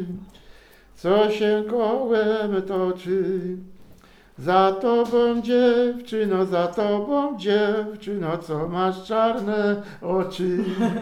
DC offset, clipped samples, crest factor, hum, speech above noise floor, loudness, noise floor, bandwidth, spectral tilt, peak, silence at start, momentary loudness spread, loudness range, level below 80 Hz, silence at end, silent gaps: under 0.1%; under 0.1%; 18 dB; none; 28 dB; -22 LUFS; -50 dBFS; 13.5 kHz; -7 dB/octave; -6 dBFS; 0 s; 9 LU; 3 LU; -56 dBFS; 0 s; none